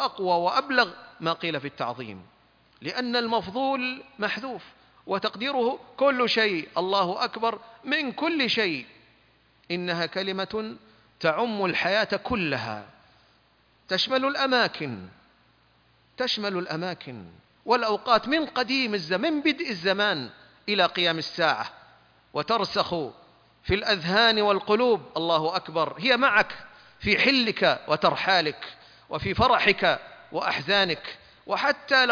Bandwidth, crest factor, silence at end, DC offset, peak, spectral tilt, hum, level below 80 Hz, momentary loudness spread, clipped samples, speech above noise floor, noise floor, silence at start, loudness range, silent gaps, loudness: 5.4 kHz; 22 dB; 0 s; under 0.1%; -4 dBFS; -5 dB/octave; none; -56 dBFS; 14 LU; under 0.1%; 37 dB; -63 dBFS; 0 s; 6 LU; none; -25 LUFS